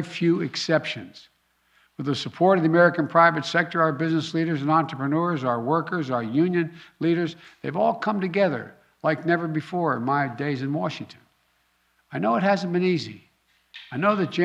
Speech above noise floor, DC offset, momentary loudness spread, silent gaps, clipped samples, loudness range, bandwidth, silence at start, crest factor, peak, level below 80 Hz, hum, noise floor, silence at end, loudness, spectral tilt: 44 dB; under 0.1%; 13 LU; none; under 0.1%; 6 LU; 9.8 kHz; 0 s; 20 dB; -4 dBFS; -72 dBFS; none; -67 dBFS; 0 s; -23 LUFS; -6.5 dB/octave